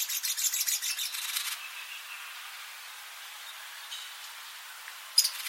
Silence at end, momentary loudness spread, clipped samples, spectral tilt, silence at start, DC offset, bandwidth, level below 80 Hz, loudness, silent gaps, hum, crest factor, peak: 0 s; 16 LU; under 0.1%; 9 dB/octave; 0 s; under 0.1%; 16.5 kHz; under -90 dBFS; -32 LUFS; none; none; 28 dB; -8 dBFS